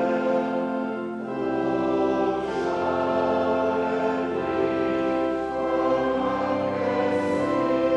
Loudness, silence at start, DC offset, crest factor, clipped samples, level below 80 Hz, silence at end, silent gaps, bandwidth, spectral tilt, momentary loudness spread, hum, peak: -25 LUFS; 0 s; under 0.1%; 12 dB; under 0.1%; -56 dBFS; 0 s; none; 9.8 kHz; -7 dB/octave; 4 LU; none; -12 dBFS